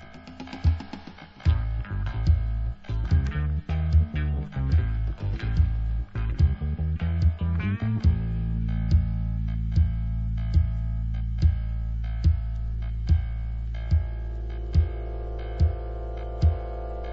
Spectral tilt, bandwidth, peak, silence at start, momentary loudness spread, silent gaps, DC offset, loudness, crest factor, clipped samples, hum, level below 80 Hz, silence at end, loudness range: -9 dB/octave; 5.6 kHz; -10 dBFS; 0 s; 10 LU; none; under 0.1%; -27 LUFS; 16 dB; under 0.1%; none; -28 dBFS; 0 s; 2 LU